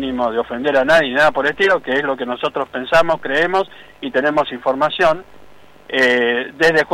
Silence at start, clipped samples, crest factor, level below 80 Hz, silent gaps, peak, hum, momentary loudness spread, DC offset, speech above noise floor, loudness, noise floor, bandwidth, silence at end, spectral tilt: 0 s; under 0.1%; 12 dB; -48 dBFS; none; -6 dBFS; none; 8 LU; under 0.1%; 29 dB; -16 LUFS; -45 dBFS; 15 kHz; 0 s; -4.5 dB/octave